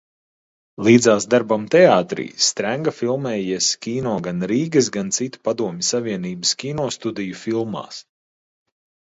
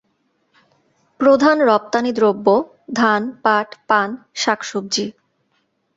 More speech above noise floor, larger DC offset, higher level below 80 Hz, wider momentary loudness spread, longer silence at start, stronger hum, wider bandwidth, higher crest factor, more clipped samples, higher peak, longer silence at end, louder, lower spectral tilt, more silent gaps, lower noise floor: first, over 71 dB vs 50 dB; neither; about the same, -60 dBFS vs -64 dBFS; first, 12 LU vs 9 LU; second, 0.8 s vs 1.2 s; neither; about the same, 8 kHz vs 8 kHz; about the same, 20 dB vs 16 dB; neither; about the same, 0 dBFS vs -2 dBFS; first, 1.1 s vs 0.85 s; about the same, -19 LUFS vs -17 LUFS; about the same, -4 dB/octave vs -4 dB/octave; neither; first, under -90 dBFS vs -66 dBFS